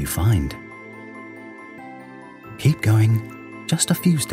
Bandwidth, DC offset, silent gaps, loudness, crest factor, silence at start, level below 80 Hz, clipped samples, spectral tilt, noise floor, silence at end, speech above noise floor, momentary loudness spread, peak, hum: 16 kHz; under 0.1%; none; -20 LUFS; 16 dB; 0 s; -42 dBFS; under 0.1%; -5 dB/octave; -40 dBFS; 0 s; 22 dB; 21 LU; -6 dBFS; none